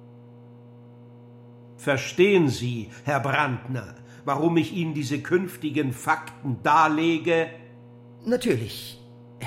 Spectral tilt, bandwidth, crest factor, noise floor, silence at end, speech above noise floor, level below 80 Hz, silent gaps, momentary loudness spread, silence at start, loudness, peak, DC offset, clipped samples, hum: -6 dB/octave; 16 kHz; 20 dB; -47 dBFS; 0 s; 23 dB; -64 dBFS; none; 15 LU; 0 s; -24 LUFS; -6 dBFS; under 0.1%; under 0.1%; 60 Hz at -50 dBFS